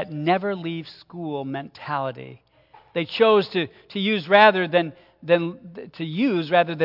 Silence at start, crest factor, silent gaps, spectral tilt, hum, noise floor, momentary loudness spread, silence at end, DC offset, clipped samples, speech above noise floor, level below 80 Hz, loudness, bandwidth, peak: 0 s; 22 dB; none; -8 dB/octave; none; -54 dBFS; 18 LU; 0 s; under 0.1%; under 0.1%; 32 dB; -70 dBFS; -22 LUFS; 5.8 kHz; 0 dBFS